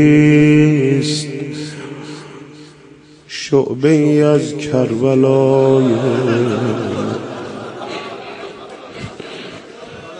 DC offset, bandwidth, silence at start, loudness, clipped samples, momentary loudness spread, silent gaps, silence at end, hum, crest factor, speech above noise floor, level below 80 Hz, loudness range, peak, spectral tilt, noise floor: under 0.1%; 10.5 kHz; 0 s; -14 LUFS; under 0.1%; 21 LU; none; 0 s; none; 14 dB; 30 dB; -54 dBFS; 9 LU; 0 dBFS; -7 dB/octave; -42 dBFS